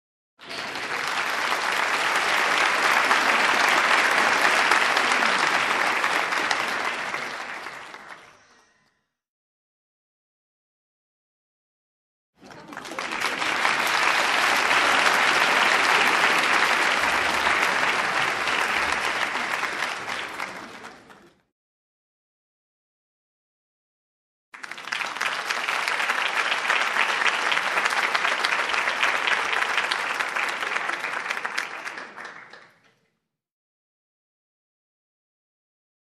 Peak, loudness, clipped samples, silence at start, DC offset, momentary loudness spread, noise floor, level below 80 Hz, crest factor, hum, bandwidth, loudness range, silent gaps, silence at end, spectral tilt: -2 dBFS; -22 LUFS; under 0.1%; 0.4 s; under 0.1%; 15 LU; -77 dBFS; -64 dBFS; 22 dB; none; 13.5 kHz; 15 LU; 9.29-12.33 s, 21.52-24.52 s; 3.45 s; -0.5 dB/octave